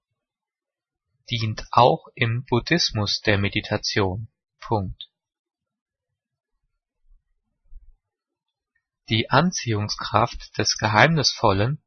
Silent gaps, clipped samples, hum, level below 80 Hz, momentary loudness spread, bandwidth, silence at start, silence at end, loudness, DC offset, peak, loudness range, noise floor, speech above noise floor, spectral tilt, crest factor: 5.39-5.44 s, 5.81-5.86 s; under 0.1%; none; -48 dBFS; 10 LU; 6.6 kHz; 1.3 s; 0.1 s; -22 LUFS; under 0.1%; 0 dBFS; 13 LU; under -90 dBFS; over 68 dB; -4.5 dB/octave; 24 dB